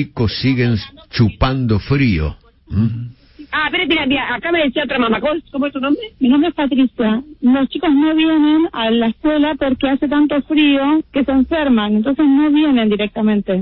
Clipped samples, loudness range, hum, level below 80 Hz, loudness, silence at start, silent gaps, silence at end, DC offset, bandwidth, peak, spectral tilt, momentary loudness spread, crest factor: under 0.1%; 3 LU; none; -36 dBFS; -16 LUFS; 0 s; none; 0 s; under 0.1%; 5.8 kHz; -2 dBFS; -10 dB/octave; 6 LU; 14 dB